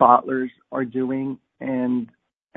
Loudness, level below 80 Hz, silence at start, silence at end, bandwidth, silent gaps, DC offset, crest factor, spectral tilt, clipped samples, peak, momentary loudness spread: -24 LUFS; -70 dBFS; 0 s; 0.5 s; 3.8 kHz; none; under 0.1%; 22 dB; -10 dB/octave; under 0.1%; 0 dBFS; 13 LU